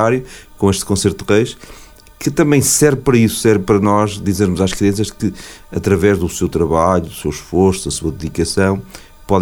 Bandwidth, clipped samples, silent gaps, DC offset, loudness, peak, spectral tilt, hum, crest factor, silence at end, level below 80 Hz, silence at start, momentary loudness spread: over 20 kHz; under 0.1%; none; under 0.1%; -15 LUFS; 0 dBFS; -5 dB/octave; none; 14 dB; 0 s; -36 dBFS; 0 s; 10 LU